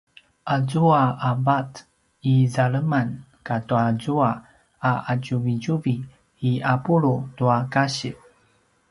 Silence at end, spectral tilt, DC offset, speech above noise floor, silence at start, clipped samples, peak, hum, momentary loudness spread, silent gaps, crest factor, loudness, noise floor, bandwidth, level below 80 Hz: 0.75 s; -7 dB/octave; under 0.1%; 41 dB; 0.45 s; under 0.1%; -6 dBFS; none; 10 LU; none; 18 dB; -22 LUFS; -63 dBFS; 11.5 kHz; -60 dBFS